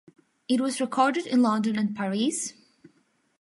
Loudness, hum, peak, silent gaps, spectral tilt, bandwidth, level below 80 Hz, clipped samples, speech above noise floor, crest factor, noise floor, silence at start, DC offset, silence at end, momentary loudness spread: -26 LUFS; none; -8 dBFS; none; -4.5 dB/octave; 11.5 kHz; -76 dBFS; under 0.1%; 42 dB; 18 dB; -67 dBFS; 0.5 s; under 0.1%; 0.9 s; 8 LU